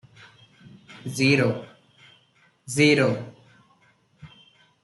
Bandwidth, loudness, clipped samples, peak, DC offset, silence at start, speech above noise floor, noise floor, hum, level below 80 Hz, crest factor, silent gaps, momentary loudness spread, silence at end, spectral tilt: 12.5 kHz; -22 LUFS; under 0.1%; -6 dBFS; under 0.1%; 0.9 s; 41 dB; -62 dBFS; none; -66 dBFS; 22 dB; none; 18 LU; 0.55 s; -5 dB/octave